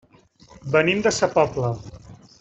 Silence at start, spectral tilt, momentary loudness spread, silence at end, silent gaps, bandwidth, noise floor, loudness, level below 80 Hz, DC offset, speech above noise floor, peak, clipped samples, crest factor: 0.65 s; -4.5 dB/octave; 18 LU; 0.25 s; none; 8.2 kHz; -53 dBFS; -21 LUFS; -52 dBFS; under 0.1%; 32 dB; -4 dBFS; under 0.1%; 20 dB